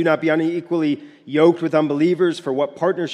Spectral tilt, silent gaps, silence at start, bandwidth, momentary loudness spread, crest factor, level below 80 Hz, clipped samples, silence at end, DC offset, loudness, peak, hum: -7 dB/octave; none; 0 s; 10 kHz; 7 LU; 16 dB; -72 dBFS; under 0.1%; 0 s; under 0.1%; -19 LUFS; -4 dBFS; none